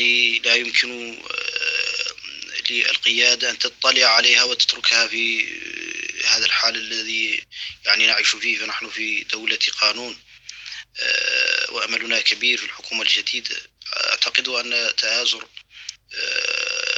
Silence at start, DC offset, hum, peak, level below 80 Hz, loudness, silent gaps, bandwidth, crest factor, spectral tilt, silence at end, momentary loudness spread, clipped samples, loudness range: 0 s; under 0.1%; none; 0 dBFS; -66 dBFS; -18 LUFS; none; 8.6 kHz; 22 dB; 1.5 dB/octave; 0 s; 14 LU; under 0.1%; 5 LU